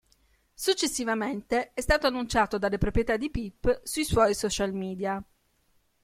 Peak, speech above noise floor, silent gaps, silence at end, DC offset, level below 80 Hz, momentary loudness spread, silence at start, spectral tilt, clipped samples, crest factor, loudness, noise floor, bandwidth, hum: -8 dBFS; 41 dB; none; 0.8 s; under 0.1%; -42 dBFS; 7 LU; 0.6 s; -4 dB/octave; under 0.1%; 20 dB; -28 LUFS; -68 dBFS; 16.5 kHz; none